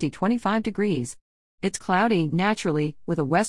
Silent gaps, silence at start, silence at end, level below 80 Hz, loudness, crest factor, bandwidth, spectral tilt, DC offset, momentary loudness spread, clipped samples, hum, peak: 1.21-1.58 s; 0 s; 0 s; -56 dBFS; -24 LUFS; 16 dB; 12 kHz; -5.5 dB/octave; 0.4%; 8 LU; under 0.1%; none; -8 dBFS